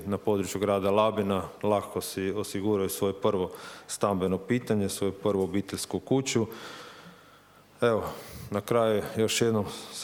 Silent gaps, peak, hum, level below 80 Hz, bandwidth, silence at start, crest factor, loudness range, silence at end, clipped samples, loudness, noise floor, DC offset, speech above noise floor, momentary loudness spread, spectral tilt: none; -10 dBFS; none; -60 dBFS; over 20 kHz; 0 s; 18 dB; 3 LU; 0 s; under 0.1%; -28 LUFS; -56 dBFS; under 0.1%; 28 dB; 10 LU; -5 dB/octave